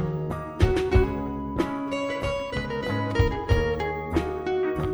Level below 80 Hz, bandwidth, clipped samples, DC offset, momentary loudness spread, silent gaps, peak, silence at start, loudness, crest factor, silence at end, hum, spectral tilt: -32 dBFS; over 20 kHz; under 0.1%; under 0.1%; 6 LU; none; -8 dBFS; 0 s; -26 LUFS; 18 dB; 0 s; none; -7 dB/octave